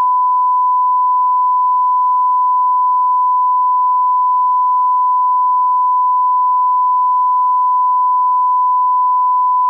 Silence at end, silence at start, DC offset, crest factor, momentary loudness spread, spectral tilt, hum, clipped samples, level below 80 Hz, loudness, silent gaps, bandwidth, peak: 0 s; 0 s; under 0.1%; 4 dB; 0 LU; 0 dB/octave; none; under 0.1%; under -90 dBFS; -13 LUFS; none; 1.2 kHz; -10 dBFS